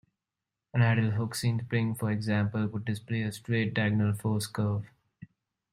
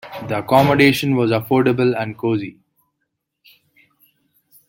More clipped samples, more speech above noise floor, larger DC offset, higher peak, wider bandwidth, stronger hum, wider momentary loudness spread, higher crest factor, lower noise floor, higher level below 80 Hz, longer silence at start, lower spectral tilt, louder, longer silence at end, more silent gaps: neither; about the same, 60 dB vs 59 dB; neither; second, -14 dBFS vs -2 dBFS; second, 15 kHz vs 17 kHz; neither; second, 7 LU vs 11 LU; about the same, 16 dB vs 18 dB; first, -89 dBFS vs -75 dBFS; second, -64 dBFS vs -54 dBFS; first, 0.75 s vs 0.05 s; about the same, -6.5 dB/octave vs -6.5 dB/octave; second, -30 LUFS vs -17 LUFS; second, 0.5 s vs 2.15 s; neither